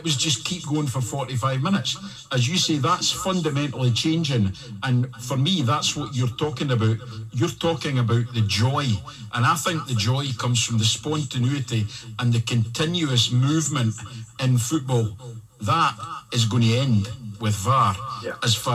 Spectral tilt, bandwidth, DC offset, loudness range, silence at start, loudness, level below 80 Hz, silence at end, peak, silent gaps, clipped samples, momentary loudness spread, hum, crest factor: -4.5 dB/octave; 14.5 kHz; under 0.1%; 1 LU; 0 s; -23 LUFS; -56 dBFS; 0 s; -8 dBFS; none; under 0.1%; 7 LU; none; 16 dB